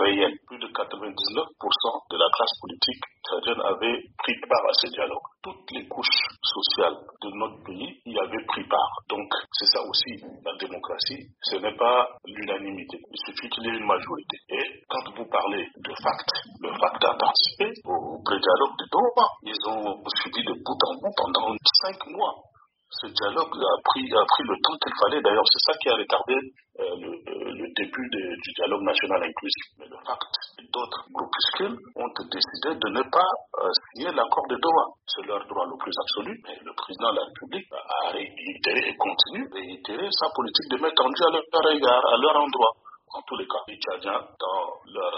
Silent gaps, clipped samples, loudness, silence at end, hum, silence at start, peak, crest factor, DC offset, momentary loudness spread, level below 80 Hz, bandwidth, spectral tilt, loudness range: none; under 0.1%; -25 LUFS; 0 s; none; 0 s; 0 dBFS; 26 dB; under 0.1%; 14 LU; -70 dBFS; 5.8 kHz; 0.5 dB/octave; 6 LU